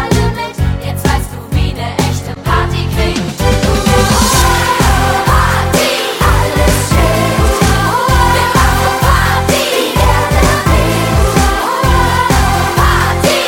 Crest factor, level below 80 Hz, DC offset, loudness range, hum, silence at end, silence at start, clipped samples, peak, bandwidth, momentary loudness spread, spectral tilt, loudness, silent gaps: 10 dB; -16 dBFS; under 0.1%; 3 LU; none; 0 s; 0 s; under 0.1%; 0 dBFS; 18 kHz; 6 LU; -4.5 dB/octave; -11 LUFS; none